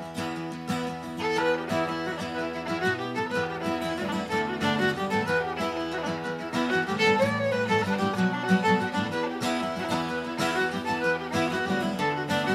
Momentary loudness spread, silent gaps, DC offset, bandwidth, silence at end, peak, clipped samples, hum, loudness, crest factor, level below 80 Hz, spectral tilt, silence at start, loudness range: 7 LU; none; under 0.1%; 15 kHz; 0 s; -10 dBFS; under 0.1%; none; -27 LUFS; 18 dB; -62 dBFS; -5 dB/octave; 0 s; 4 LU